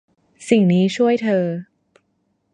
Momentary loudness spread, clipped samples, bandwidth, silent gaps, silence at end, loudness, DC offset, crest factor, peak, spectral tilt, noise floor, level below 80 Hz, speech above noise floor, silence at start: 14 LU; under 0.1%; 10.5 kHz; none; 0.9 s; -18 LUFS; under 0.1%; 18 dB; -2 dBFS; -7 dB/octave; -68 dBFS; -66 dBFS; 51 dB; 0.4 s